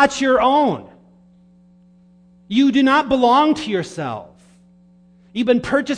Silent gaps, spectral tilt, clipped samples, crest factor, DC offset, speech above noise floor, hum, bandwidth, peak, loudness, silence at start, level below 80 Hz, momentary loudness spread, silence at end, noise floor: none; -5 dB/octave; under 0.1%; 18 dB; under 0.1%; 34 dB; none; 10 kHz; 0 dBFS; -17 LUFS; 0 s; -52 dBFS; 14 LU; 0 s; -50 dBFS